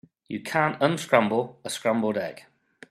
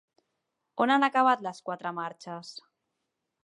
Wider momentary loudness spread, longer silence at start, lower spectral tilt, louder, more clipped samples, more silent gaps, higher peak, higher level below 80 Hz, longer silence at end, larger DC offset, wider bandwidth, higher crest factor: second, 13 LU vs 19 LU; second, 0.3 s vs 0.75 s; about the same, -5 dB/octave vs -4.5 dB/octave; about the same, -25 LUFS vs -27 LUFS; neither; neither; first, -2 dBFS vs -10 dBFS; first, -70 dBFS vs -86 dBFS; second, 0.5 s vs 0.85 s; neither; first, 14 kHz vs 11 kHz; about the same, 24 dB vs 20 dB